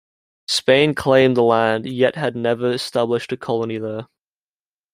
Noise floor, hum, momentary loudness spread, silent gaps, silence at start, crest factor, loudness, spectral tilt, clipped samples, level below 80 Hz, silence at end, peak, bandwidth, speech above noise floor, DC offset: under -90 dBFS; none; 11 LU; none; 0.5 s; 18 dB; -18 LUFS; -5 dB/octave; under 0.1%; -58 dBFS; 0.9 s; -2 dBFS; 16 kHz; over 72 dB; under 0.1%